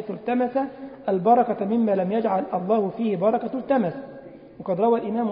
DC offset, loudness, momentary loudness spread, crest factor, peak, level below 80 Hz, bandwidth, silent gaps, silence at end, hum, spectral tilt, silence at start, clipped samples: under 0.1%; -23 LUFS; 13 LU; 16 dB; -6 dBFS; -66 dBFS; 5.2 kHz; none; 0 s; none; -12 dB/octave; 0 s; under 0.1%